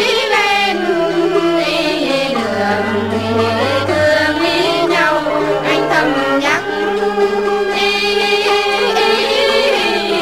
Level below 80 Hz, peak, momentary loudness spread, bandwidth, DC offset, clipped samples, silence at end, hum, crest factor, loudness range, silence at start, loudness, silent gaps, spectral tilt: -46 dBFS; -2 dBFS; 3 LU; 16 kHz; 0.5%; under 0.1%; 0 s; none; 12 dB; 1 LU; 0 s; -14 LUFS; none; -4 dB/octave